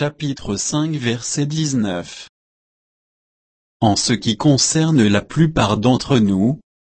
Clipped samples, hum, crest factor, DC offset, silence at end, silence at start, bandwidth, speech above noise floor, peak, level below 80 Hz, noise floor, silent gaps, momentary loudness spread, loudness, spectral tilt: under 0.1%; none; 16 dB; under 0.1%; 0.25 s; 0 s; 8.8 kHz; over 73 dB; -2 dBFS; -44 dBFS; under -90 dBFS; 2.29-3.80 s; 9 LU; -17 LUFS; -5 dB/octave